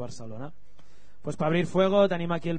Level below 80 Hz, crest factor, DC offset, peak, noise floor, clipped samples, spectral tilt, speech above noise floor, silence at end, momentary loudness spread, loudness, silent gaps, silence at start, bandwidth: -56 dBFS; 18 dB; 2%; -8 dBFS; -59 dBFS; under 0.1%; -7 dB/octave; 33 dB; 0 s; 19 LU; -25 LUFS; none; 0 s; 9.6 kHz